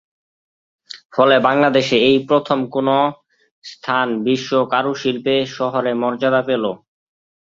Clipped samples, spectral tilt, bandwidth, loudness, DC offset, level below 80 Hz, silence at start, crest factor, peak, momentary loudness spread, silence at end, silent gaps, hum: under 0.1%; -5.5 dB/octave; 7.6 kHz; -17 LUFS; under 0.1%; -62 dBFS; 0.95 s; 18 dB; 0 dBFS; 11 LU; 0.8 s; 1.05-1.10 s, 3.51-3.62 s; none